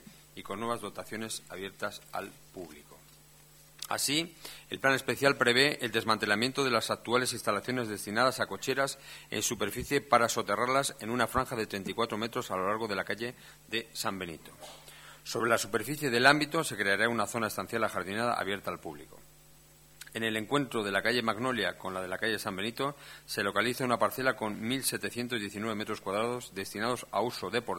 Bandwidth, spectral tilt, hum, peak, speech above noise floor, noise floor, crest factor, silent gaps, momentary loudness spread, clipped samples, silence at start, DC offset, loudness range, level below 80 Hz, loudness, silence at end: 19 kHz; -3 dB/octave; none; -6 dBFS; 26 dB; -58 dBFS; 26 dB; none; 15 LU; under 0.1%; 0.05 s; under 0.1%; 7 LU; -62 dBFS; -31 LUFS; 0 s